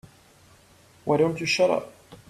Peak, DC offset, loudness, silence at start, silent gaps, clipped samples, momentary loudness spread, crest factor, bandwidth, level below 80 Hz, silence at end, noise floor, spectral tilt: -8 dBFS; under 0.1%; -24 LUFS; 1.05 s; none; under 0.1%; 14 LU; 20 dB; 14 kHz; -64 dBFS; 0.15 s; -55 dBFS; -4.5 dB/octave